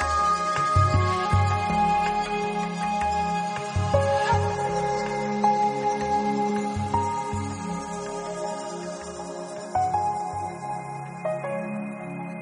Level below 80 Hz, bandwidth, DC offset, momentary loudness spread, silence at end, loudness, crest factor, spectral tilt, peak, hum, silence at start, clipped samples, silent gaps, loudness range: -44 dBFS; 10.5 kHz; under 0.1%; 11 LU; 0 s; -26 LUFS; 16 dB; -5.5 dB/octave; -8 dBFS; none; 0 s; under 0.1%; none; 6 LU